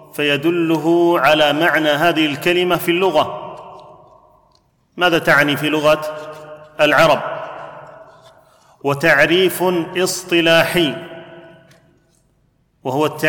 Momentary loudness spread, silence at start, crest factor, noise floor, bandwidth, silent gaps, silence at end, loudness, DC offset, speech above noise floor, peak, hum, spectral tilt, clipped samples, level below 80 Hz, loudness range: 19 LU; 0.15 s; 16 dB; -60 dBFS; 19 kHz; none; 0 s; -15 LUFS; under 0.1%; 45 dB; -2 dBFS; none; -4.5 dB/octave; under 0.1%; -52 dBFS; 4 LU